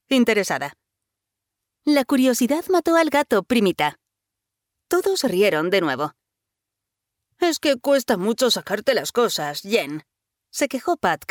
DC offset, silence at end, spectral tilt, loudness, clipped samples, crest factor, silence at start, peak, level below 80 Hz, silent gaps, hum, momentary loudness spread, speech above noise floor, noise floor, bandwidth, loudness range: under 0.1%; 0.05 s; -3.5 dB/octave; -21 LUFS; under 0.1%; 16 dB; 0.1 s; -6 dBFS; -62 dBFS; none; none; 8 LU; 64 dB; -84 dBFS; over 20 kHz; 3 LU